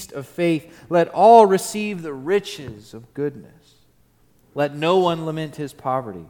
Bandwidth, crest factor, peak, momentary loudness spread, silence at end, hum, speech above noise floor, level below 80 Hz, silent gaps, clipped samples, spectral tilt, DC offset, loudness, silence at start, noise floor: 18 kHz; 20 dB; 0 dBFS; 21 LU; 0.05 s; none; 38 dB; -62 dBFS; none; under 0.1%; -5.5 dB/octave; under 0.1%; -19 LUFS; 0 s; -58 dBFS